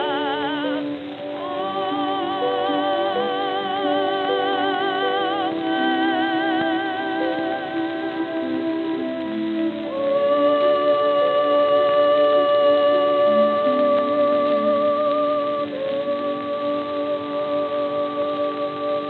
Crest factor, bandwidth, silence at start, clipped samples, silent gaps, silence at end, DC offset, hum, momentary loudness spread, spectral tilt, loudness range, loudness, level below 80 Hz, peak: 12 dB; 4.6 kHz; 0 s; under 0.1%; none; 0 s; under 0.1%; none; 8 LU; -7 dB/octave; 6 LU; -21 LUFS; -70 dBFS; -8 dBFS